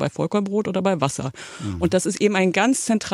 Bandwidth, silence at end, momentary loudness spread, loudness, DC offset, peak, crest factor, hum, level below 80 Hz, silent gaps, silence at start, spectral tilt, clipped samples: 14.5 kHz; 0 s; 11 LU; -21 LUFS; under 0.1%; -4 dBFS; 16 dB; none; -54 dBFS; none; 0 s; -5 dB/octave; under 0.1%